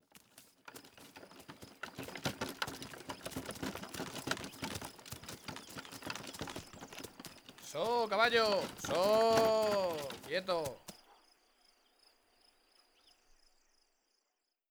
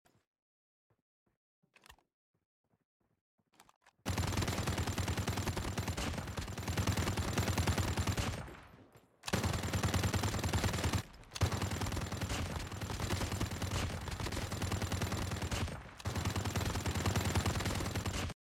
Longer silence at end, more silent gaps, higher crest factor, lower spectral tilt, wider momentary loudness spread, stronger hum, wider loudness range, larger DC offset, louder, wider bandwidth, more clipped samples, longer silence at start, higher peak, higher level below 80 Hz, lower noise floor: first, 3.75 s vs 0.15 s; second, none vs 2.14-2.34 s, 2.45-2.64 s, 2.85-3.00 s, 3.21-3.38 s, 3.76-3.81 s; first, 24 dB vs 18 dB; about the same, -3.5 dB/octave vs -4.5 dB/octave; first, 24 LU vs 7 LU; neither; first, 13 LU vs 3 LU; neither; about the same, -36 LUFS vs -37 LUFS; first, over 20 kHz vs 17 kHz; neither; second, 0.35 s vs 1.9 s; first, -16 dBFS vs -20 dBFS; second, -68 dBFS vs -46 dBFS; first, -85 dBFS vs -64 dBFS